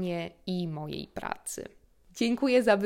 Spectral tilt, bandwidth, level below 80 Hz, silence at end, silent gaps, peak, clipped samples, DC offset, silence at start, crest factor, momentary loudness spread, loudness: -5 dB/octave; 16 kHz; -62 dBFS; 0 s; none; -10 dBFS; under 0.1%; under 0.1%; 0 s; 20 dB; 15 LU; -31 LUFS